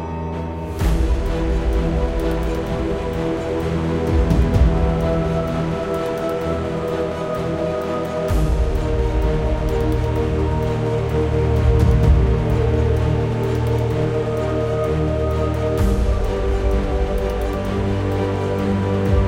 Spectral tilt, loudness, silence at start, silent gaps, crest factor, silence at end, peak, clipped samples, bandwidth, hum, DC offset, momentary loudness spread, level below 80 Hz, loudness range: -8 dB/octave; -20 LUFS; 0 s; none; 16 dB; 0 s; -2 dBFS; under 0.1%; 16 kHz; none; under 0.1%; 6 LU; -22 dBFS; 4 LU